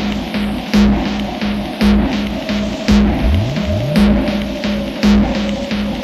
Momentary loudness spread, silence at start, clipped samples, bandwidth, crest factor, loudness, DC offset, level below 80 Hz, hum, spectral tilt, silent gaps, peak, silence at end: 7 LU; 0 s; under 0.1%; 13 kHz; 14 dB; -16 LUFS; under 0.1%; -24 dBFS; none; -6.5 dB/octave; none; 0 dBFS; 0 s